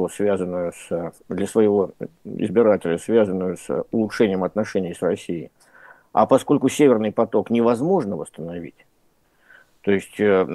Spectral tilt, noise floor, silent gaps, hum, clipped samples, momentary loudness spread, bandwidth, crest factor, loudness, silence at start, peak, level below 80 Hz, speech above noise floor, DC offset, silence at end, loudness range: -6.5 dB/octave; -62 dBFS; none; none; under 0.1%; 14 LU; 12.5 kHz; 18 dB; -21 LUFS; 0 s; -4 dBFS; -62 dBFS; 42 dB; under 0.1%; 0 s; 3 LU